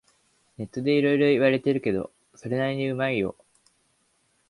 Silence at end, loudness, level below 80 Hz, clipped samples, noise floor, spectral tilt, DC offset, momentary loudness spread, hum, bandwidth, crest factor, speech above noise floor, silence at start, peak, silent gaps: 1.15 s; -24 LUFS; -62 dBFS; under 0.1%; -68 dBFS; -7.5 dB/octave; under 0.1%; 16 LU; none; 11.5 kHz; 18 dB; 45 dB; 0.6 s; -8 dBFS; none